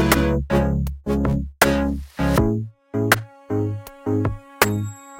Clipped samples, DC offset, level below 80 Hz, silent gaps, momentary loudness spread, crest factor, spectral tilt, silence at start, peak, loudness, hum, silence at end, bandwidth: under 0.1%; under 0.1%; -32 dBFS; none; 9 LU; 20 dB; -5.5 dB/octave; 0 s; 0 dBFS; -22 LUFS; none; 0 s; 17 kHz